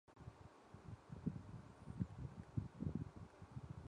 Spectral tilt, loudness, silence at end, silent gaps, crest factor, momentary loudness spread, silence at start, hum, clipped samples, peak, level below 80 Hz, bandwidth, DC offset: -8.5 dB/octave; -52 LUFS; 0 s; none; 22 dB; 13 LU; 0.1 s; none; under 0.1%; -28 dBFS; -62 dBFS; 10.5 kHz; under 0.1%